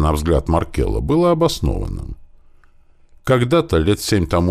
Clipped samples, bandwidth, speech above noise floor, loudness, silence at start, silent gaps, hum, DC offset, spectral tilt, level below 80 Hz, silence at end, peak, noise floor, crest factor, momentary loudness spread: under 0.1%; 16 kHz; 32 dB; -18 LUFS; 0 s; none; none; under 0.1%; -6.5 dB/octave; -28 dBFS; 0 s; -2 dBFS; -48 dBFS; 16 dB; 12 LU